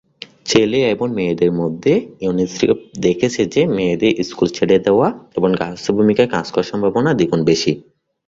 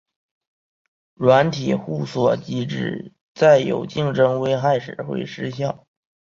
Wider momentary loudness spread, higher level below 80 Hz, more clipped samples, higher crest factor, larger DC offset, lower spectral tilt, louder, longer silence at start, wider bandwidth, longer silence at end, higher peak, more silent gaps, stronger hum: second, 5 LU vs 13 LU; first, -50 dBFS vs -60 dBFS; neither; about the same, 16 dB vs 20 dB; neither; about the same, -5.5 dB/octave vs -6.5 dB/octave; first, -17 LUFS vs -20 LUFS; second, 0.45 s vs 1.2 s; about the same, 7.8 kHz vs 7.4 kHz; second, 0.45 s vs 0.65 s; about the same, 0 dBFS vs -2 dBFS; second, none vs 3.21-3.35 s; neither